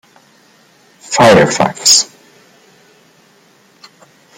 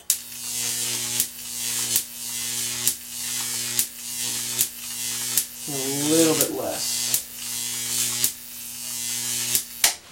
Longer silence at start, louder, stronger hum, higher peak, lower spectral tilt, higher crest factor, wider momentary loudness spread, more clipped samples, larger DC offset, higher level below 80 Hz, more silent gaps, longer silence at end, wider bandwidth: first, 1.1 s vs 0 s; first, -9 LUFS vs -24 LUFS; neither; about the same, 0 dBFS vs 0 dBFS; first, -2.5 dB/octave vs -1 dB/octave; second, 16 dB vs 26 dB; first, 10 LU vs 7 LU; neither; neither; first, -50 dBFS vs -64 dBFS; neither; first, 2.35 s vs 0 s; about the same, 16.5 kHz vs 16.5 kHz